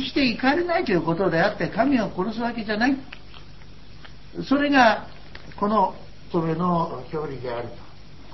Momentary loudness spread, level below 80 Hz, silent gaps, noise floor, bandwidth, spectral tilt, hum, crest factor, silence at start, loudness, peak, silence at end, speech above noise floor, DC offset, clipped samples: 19 LU; -48 dBFS; none; -45 dBFS; 6.2 kHz; -6.5 dB/octave; 50 Hz at -50 dBFS; 20 dB; 0 s; -23 LUFS; -4 dBFS; 0 s; 23 dB; 1%; under 0.1%